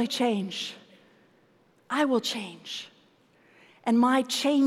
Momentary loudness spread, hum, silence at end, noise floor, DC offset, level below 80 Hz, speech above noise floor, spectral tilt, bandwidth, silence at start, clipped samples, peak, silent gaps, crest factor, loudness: 15 LU; none; 0 s; -63 dBFS; under 0.1%; -86 dBFS; 37 dB; -4 dB/octave; 15 kHz; 0 s; under 0.1%; -12 dBFS; none; 16 dB; -27 LUFS